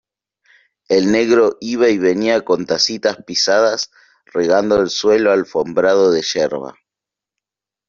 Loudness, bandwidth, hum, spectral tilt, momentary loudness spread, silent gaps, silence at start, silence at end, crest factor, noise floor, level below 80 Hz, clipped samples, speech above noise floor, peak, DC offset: -15 LUFS; 7.4 kHz; none; -3.5 dB/octave; 7 LU; none; 0.9 s; 1.2 s; 14 dB; -86 dBFS; -54 dBFS; under 0.1%; 71 dB; -2 dBFS; under 0.1%